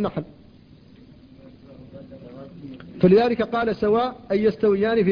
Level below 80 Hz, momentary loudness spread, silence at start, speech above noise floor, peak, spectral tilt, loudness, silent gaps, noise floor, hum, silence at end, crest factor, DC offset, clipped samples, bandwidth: -54 dBFS; 25 LU; 0 s; 29 dB; -6 dBFS; -9 dB/octave; -21 LUFS; none; -49 dBFS; none; 0 s; 18 dB; under 0.1%; under 0.1%; 5.2 kHz